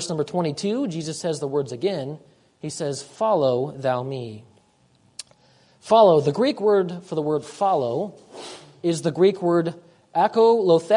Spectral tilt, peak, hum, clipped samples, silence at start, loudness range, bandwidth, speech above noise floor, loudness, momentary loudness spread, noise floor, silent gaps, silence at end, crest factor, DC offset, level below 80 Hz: -6 dB/octave; -4 dBFS; none; under 0.1%; 0 s; 6 LU; 11 kHz; 39 dB; -22 LUFS; 20 LU; -60 dBFS; none; 0 s; 18 dB; under 0.1%; -68 dBFS